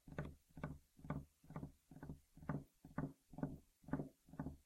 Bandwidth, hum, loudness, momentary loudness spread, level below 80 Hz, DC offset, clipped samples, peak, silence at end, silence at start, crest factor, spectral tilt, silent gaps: 15.5 kHz; none; -52 LUFS; 9 LU; -64 dBFS; under 0.1%; under 0.1%; -30 dBFS; 0.05 s; 0.05 s; 22 dB; -8.5 dB/octave; none